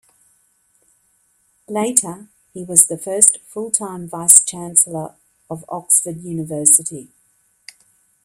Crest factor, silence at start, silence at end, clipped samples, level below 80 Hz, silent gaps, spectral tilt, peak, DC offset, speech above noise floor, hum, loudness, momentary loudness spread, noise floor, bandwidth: 20 dB; 1.7 s; 1.2 s; 0.2%; -64 dBFS; none; -3 dB/octave; 0 dBFS; under 0.1%; 44 dB; none; -14 LUFS; 21 LU; -61 dBFS; 16 kHz